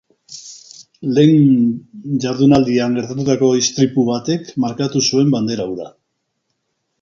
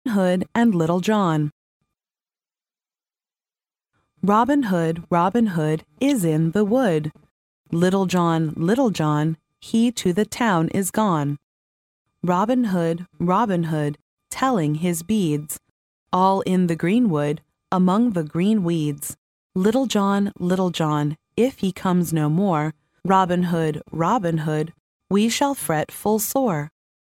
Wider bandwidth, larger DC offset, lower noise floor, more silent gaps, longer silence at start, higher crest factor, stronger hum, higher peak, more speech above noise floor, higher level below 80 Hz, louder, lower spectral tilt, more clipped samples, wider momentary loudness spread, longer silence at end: second, 7.6 kHz vs 17 kHz; neither; second, -72 dBFS vs under -90 dBFS; second, none vs 1.52-1.80 s, 7.31-7.65 s, 11.43-12.05 s, 14.02-14.17 s, 15.70-16.06 s, 19.18-19.50 s, 24.80-25.00 s; first, 0.3 s vs 0.05 s; about the same, 16 dB vs 16 dB; neither; first, 0 dBFS vs -4 dBFS; second, 57 dB vs over 70 dB; first, -52 dBFS vs -58 dBFS; first, -16 LUFS vs -21 LUFS; about the same, -5.5 dB/octave vs -6 dB/octave; neither; first, 21 LU vs 8 LU; first, 1.1 s vs 0.4 s